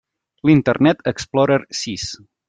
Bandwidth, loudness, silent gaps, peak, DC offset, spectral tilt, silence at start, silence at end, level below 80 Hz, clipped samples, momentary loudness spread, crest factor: 9.4 kHz; -18 LUFS; none; -2 dBFS; under 0.1%; -5.5 dB/octave; 0.45 s; 0.35 s; -52 dBFS; under 0.1%; 11 LU; 16 dB